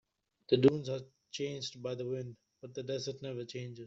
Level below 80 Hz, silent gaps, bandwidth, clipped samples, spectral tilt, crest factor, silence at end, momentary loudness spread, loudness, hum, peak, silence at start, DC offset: -72 dBFS; none; 7.8 kHz; under 0.1%; -6 dB/octave; 24 dB; 0 s; 18 LU; -35 LUFS; none; -12 dBFS; 0.5 s; under 0.1%